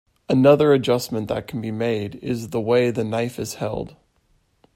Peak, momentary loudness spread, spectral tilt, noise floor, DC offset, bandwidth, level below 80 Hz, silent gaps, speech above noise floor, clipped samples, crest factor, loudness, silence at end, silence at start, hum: -2 dBFS; 13 LU; -6.5 dB/octave; -64 dBFS; under 0.1%; 16 kHz; -54 dBFS; none; 43 dB; under 0.1%; 18 dB; -21 LUFS; 0.85 s; 0.3 s; none